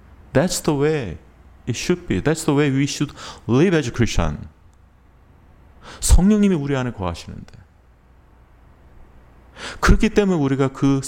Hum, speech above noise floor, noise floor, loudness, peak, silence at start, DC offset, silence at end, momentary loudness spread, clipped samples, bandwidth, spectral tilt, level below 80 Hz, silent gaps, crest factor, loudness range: none; 33 dB; -51 dBFS; -20 LUFS; 0 dBFS; 0.35 s; under 0.1%; 0 s; 17 LU; under 0.1%; 17 kHz; -5.5 dB/octave; -28 dBFS; none; 20 dB; 4 LU